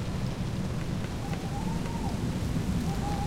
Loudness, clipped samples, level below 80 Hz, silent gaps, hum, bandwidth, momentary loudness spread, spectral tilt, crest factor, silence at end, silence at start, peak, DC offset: -32 LUFS; under 0.1%; -38 dBFS; none; none; 16 kHz; 3 LU; -6.5 dB/octave; 14 dB; 0 s; 0 s; -16 dBFS; under 0.1%